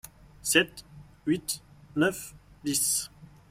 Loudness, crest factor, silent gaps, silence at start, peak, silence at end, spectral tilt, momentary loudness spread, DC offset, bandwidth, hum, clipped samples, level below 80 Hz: -28 LUFS; 24 dB; none; 0.45 s; -6 dBFS; 0.25 s; -2.5 dB/octave; 17 LU; under 0.1%; 16 kHz; none; under 0.1%; -60 dBFS